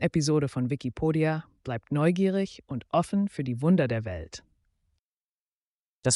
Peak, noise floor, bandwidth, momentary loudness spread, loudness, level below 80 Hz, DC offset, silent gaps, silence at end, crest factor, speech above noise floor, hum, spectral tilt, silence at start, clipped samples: -12 dBFS; under -90 dBFS; 11.5 kHz; 12 LU; -28 LUFS; -56 dBFS; under 0.1%; 4.99-6.02 s; 0 s; 16 dB; over 63 dB; none; -6 dB/octave; 0 s; under 0.1%